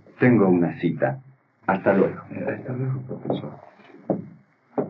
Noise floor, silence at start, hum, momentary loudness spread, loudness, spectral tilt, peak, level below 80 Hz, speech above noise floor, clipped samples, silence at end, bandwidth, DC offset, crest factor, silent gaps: -50 dBFS; 0.2 s; none; 13 LU; -24 LUFS; -8 dB/octave; -6 dBFS; -74 dBFS; 28 dB; under 0.1%; 0 s; 4.8 kHz; under 0.1%; 18 dB; none